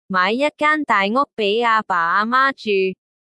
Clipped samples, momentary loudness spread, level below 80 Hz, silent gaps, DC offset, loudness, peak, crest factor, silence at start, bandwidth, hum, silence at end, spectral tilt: under 0.1%; 4 LU; -70 dBFS; 1.33-1.37 s; under 0.1%; -18 LUFS; -4 dBFS; 14 dB; 0.1 s; 11.5 kHz; none; 0.4 s; -5 dB/octave